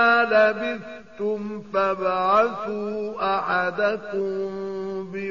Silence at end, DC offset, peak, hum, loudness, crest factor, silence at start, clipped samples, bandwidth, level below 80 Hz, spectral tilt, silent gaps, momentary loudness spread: 0 s; 0.3%; -8 dBFS; none; -23 LUFS; 16 dB; 0 s; under 0.1%; 7.2 kHz; -62 dBFS; -2.5 dB/octave; none; 12 LU